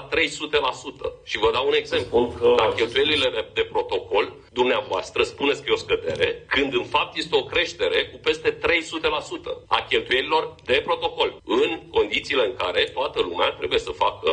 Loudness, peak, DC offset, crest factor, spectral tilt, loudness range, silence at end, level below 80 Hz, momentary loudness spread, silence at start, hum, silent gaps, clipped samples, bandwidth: -23 LUFS; -2 dBFS; under 0.1%; 20 dB; -3.5 dB/octave; 2 LU; 0 s; -50 dBFS; 5 LU; 0 s; none; none; under 0.1%; 10 kHz